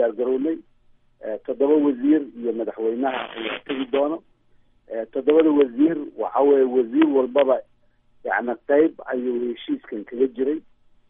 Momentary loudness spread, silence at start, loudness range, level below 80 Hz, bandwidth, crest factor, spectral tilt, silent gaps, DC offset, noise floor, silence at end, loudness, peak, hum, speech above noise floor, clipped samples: 12 LU; 0 s; 5 LU; -64 dBFS; 3.8 kHz; 16 dB; -9.5 dB/octave; none; under 0.1%; -58 dBFS; 0.5 s; -22 LUFS; -6 dBFS; none; 37 dB; under 0.1%